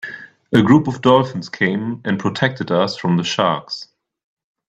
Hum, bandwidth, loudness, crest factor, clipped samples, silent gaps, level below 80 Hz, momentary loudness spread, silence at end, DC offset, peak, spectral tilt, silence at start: none; 9 kHz; -17 LUFS; 18 dB; under 0.1%; none; -56 dBFS; 12 LU; 0.85 s; under 0.1%; 0 dBFS; -6 dB/octave; 0.05 s